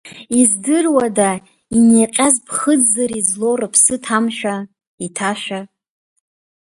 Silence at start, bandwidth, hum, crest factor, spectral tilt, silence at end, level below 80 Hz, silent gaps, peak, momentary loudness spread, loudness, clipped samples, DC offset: 0.05 s; 11.5 kHz; none; 16 dB; -3 dB/octave; 1 s; -56 dBFS; 4.87-4.98 s; 0 dBFS; 15 LU; -15 LUFS; under 0.1%; under 0.1%